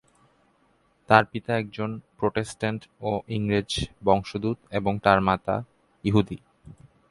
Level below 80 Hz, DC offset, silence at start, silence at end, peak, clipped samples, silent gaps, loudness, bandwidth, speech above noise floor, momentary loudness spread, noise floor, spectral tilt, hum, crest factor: -50 dBFS; under 0.1%; 1.1 s; 0.35 s; 0 dBFS; under 0.1%; none; -25 LUFS; 11.5 kHz; 40 dB; 11 LU; -65 dBFS; -6 dB/octave; none; 26 dB